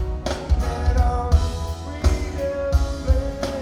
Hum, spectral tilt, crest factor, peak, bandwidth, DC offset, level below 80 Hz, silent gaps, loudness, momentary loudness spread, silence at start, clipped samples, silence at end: none; -6.5 dB/octave; 16 dB; -4 dBFS; 12 kHz; 0.1%; -22 dBFS; none; -23 LUFS; 6 LU; 0 s; under 0.1%; 0 s